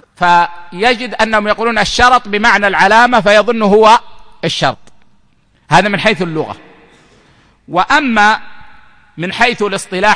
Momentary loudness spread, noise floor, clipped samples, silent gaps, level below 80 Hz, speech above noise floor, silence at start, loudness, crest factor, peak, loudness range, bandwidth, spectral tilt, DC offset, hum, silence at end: 11 LU; -53 dBFS; 0.1%; none; -38 dBFS; 42 dB; 0.2 s; -11 LUFS; 12 dB; 0 dBFS; 7 LU; 10.5 kHz; -4 dB/octave; under 0.1%; none; 0 s